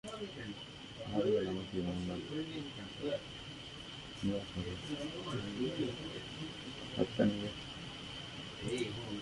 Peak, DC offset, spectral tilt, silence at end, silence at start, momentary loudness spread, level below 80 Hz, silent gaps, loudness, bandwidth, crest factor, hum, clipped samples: -16 dBFS; under 0.1%; -5.5 dB/octave; 0 s; 0.05 s; 13 LU; -60 dBFS; none; -40 LUFS; 11.5 kHz; 22 dB; none; under 0.1%